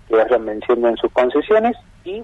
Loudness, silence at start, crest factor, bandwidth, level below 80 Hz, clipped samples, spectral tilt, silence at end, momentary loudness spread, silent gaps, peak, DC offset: -17 LUFS; 0.1 s; 14 dB; 7.2 kHz; -48 dBFS; under 0.1%; -6.5 dB/octave; 0 s; 8 LU; none; -4 dBFS; under 0.1%